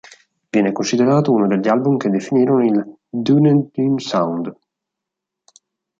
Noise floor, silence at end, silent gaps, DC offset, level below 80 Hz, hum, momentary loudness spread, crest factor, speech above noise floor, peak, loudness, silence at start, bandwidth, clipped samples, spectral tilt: -83 dBFS; 1.45 s; none; under 0.1%; -64 dBFS; none; 8 LU; 14 dB; 67 dB; -2 dBFS; -17 LUFS; 0.55 s; 7.8 kHz; under 0.1%; -7 dB/octave